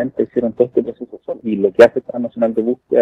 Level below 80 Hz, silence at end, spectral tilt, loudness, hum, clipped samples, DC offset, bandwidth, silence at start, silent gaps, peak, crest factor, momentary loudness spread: -56 dBFS; 0 s; -7 dB/octave; -16 LUFS; none; 0.6%; under 0.1%; 9.6 kHz; 0 s; none; 0 dBFS; 16 dB; 16 LU